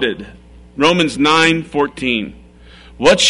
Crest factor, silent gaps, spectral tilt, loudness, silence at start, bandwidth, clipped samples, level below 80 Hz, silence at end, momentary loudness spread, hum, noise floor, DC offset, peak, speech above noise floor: 14 dB; none; -3.5 dB/octave; -14 LUFS; 0 s; 11 kHz; under 0.1%; -42 dBFS; 0 s; 17 LU; none; -41 dBFS; under 0.1%; -2 dBFS; 27 dB